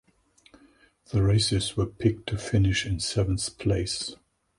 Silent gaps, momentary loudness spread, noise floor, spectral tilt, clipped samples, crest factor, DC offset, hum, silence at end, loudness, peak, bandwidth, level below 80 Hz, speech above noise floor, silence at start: none; 8 LU; -62 dBFS; -5 dB/octave; under 0.1%; 18 dB; under 0.1%; none; 0.45 s; -26 LUFS; -10 dBFS; 11.5 kHz; -42 dBFS; 36 dB; 1.1 s